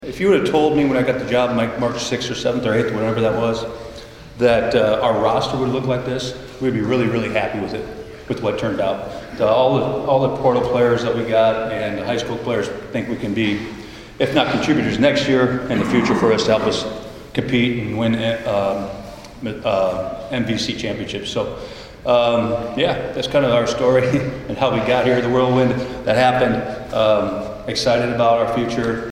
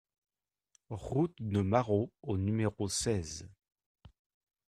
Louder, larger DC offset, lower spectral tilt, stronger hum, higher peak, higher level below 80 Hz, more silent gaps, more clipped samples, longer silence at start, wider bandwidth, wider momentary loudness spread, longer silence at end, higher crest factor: first, -19 LUFS vs -33 LUFS; neither; about the same, -6 dB/octave vs -5.5 dB/octave; neither; first, -2 dBFS vs -12 dBFS; first, -44 dBFS vs -60 dBFS; second, none vs 3.86-3.95 s; neither; second, 0 s vs 0.9 s; first, 15.5 kHz vs 13.5 kHz; second, 10 LU vs 14 LU; second, 0 s vs 0.6 s; about the same, 18 dB vs 22 dB